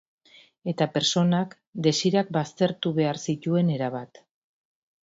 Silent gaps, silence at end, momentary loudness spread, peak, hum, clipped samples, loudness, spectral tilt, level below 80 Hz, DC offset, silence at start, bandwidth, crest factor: 1.67-1.73 s; 1 s; 11 LU; -8 dBFS; none; under 0.1%; -25 LUFS; -5.5 dB/octave; -68 dBFS; under 0.1%; 0.65 s; 7.8 kHz; 20 dB